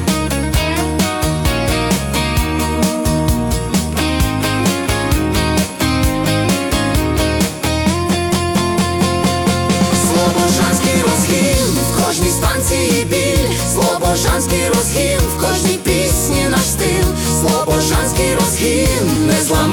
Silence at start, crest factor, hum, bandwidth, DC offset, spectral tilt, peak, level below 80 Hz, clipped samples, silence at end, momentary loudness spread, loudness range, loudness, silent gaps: 0 s; 12 dB; none; 19 kHz; under 0.1%; -4.5 dB/octave; -2 dBFS; -24 dBFS; under 0.1%; 0 s; 3 LU; 2 LU; -15 LUFS; none